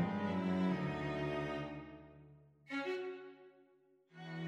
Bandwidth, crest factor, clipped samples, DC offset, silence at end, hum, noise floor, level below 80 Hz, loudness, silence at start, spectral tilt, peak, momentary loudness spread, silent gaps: 8.2 kHz; 16 dB; under 0.1%; under 0.1%; 0 s; none; -70 dBFS; -66 dBFS; -40 LUFS; 0 s; -7.5 dB/octave; -26 dBFS; 21 LU; none